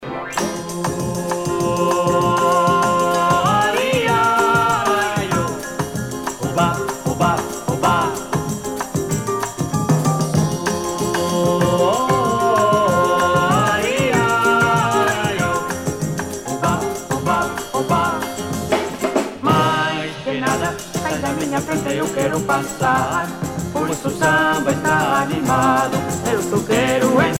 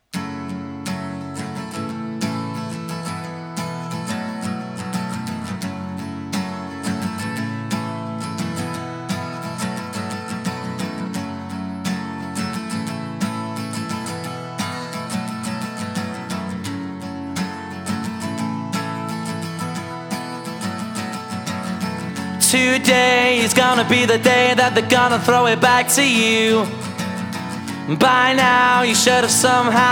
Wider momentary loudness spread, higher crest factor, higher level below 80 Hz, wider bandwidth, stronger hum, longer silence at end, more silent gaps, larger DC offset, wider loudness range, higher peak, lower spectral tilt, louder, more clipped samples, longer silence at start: second, 8 LU vs 15 LU; about the same, 16 dB vs 20 dB; first, -44 dBFS vs -62 dBFS; second, 17 kHz vs over 20 kHz; neither; about the same, 0 s vs 0 s; neither; neither; second, 5 LU vs 13 LU; about the same, -2 dBFS vs 0 dBFS; first, -5 dB/octave vs -3.5 dB/octave; about the same, -18 LUFS vs -20 LUFS; neither; second, 0 s vs 0.15 s